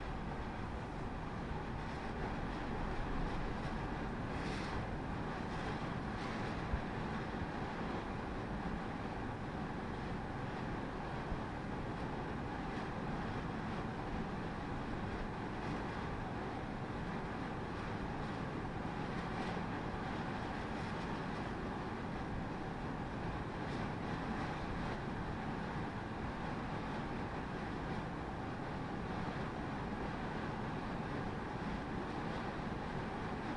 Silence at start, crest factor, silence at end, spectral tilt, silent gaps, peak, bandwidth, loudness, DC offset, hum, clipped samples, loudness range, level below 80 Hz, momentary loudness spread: 0 s; 16 dB; 0 s; -7 dB/octave; none; -26 dBFS; 11 kHz; -42 LUFS; under 0.1%; none; under 0.1%; 1 LU; -50 dBFS; 2 LU